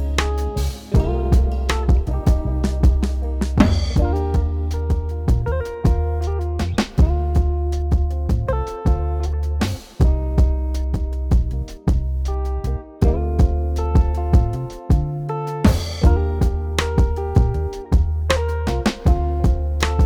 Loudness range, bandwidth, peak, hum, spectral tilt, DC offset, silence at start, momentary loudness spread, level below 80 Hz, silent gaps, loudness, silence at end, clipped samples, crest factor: 2 LU; 13 kHz; 0 dBFS; none; -7 dB/octave; under 0.1%; 0 s; 6 LU; -20 dBFS; none; -21 LUFS; 0 s; under 0.1%; 18 dB